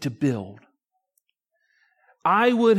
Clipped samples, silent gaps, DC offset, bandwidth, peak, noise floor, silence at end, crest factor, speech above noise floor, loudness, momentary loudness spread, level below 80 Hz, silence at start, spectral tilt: under 0.1%; none; under 0.1%; 14 kHz; -8 dBFS; -74 dBFS; 0 s; 16 dB; 54 dB; -22 LUFS; 15 LU; -72 dBFS; 0 s; -6.5 dB/octave